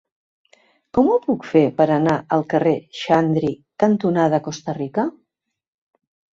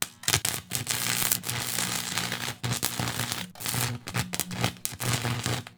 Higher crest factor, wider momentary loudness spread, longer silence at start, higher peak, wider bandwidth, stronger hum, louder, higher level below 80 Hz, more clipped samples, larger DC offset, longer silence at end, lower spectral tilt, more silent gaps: second, 18 dB vs 30 dB; about the same, 7 LU vs 6 LU; first, 0.95 s vs 0 s; about the same, -2 dBFS vs 0 dBFS; second, 7.6 kHz vs over 20 kHz; neither; first, -19 LUFS vs -28 LUFS; about the same, -58 dBFS vs -54 dBFS; neither; neither; first, 1.25 s vs 0.05 s; first, -7 dB/octave vs -2.5 dB/octave; neither